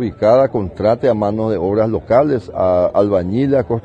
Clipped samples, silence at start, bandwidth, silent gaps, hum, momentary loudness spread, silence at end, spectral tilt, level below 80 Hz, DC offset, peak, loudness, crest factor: under 0.1%; 0 s; 8 kHz; none; none; 5 LU; 0.05 s; -9 dB/octave; -42 dBFS; under 0.1%; 0 dBFS; -15 LUFS; 14 dB